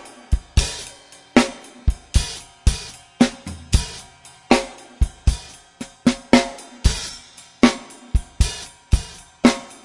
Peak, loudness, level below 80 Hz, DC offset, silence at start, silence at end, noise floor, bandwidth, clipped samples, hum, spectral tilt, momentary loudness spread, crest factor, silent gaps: 0 dBFS; -21 LUFS; -26 dBFS; under 0.1%; 0.05 s; 0.2 s; -45 dBFS; 11.5 kHz; under 0.1%; none; -5 dB/octave; 17 LU; 22 dB; none